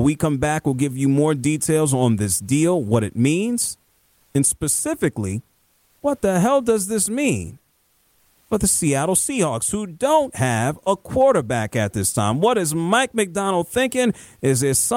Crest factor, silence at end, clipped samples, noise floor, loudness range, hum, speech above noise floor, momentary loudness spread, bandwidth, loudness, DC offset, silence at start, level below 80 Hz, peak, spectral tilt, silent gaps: 14 dB; 0 s; under 0.1%; -63 dBFS; 3 LU; none; 43 dB; 6 LU; 17 kHz; -20 LUFS; under 0.1%; 0 s; -48 dBFS; -6 dBFS; -4.5 dB/octave; none